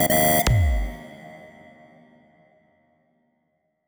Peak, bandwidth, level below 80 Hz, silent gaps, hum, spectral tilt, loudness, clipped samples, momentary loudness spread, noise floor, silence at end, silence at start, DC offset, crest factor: -8 dBFS; over 20 kHz; -32 dBFS; none; none; -4.5 dB/octave; -20 LUFS; under 0.1%; 26 LU; -72 dBFS; 2.4 s; 0 s; under 0.1%; 18 dB